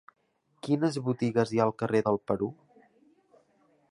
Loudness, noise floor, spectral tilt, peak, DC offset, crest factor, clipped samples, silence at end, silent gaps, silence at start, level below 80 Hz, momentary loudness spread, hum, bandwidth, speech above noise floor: -29 LUFS; -73 dBFS; -7 dB/octave; -10 dBFS; under 0.1%; 20 dB; under 0.1%; 1.4 s; none; 0.65 s; -66 dBFS; 5 LU; none; 11.5 kHz; 45 dB